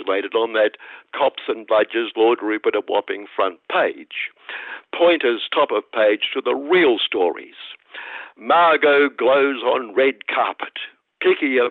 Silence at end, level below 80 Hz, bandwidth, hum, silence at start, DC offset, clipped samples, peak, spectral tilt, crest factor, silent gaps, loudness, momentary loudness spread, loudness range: 0 s; -76 dBFS; 4.5 kHz; none; 0 s; under 0.1%; under 0.1%; -6 dBFS; -6.5 dB/octave; 14 dB; none; -19 LUFS; 17 LU; 3 LU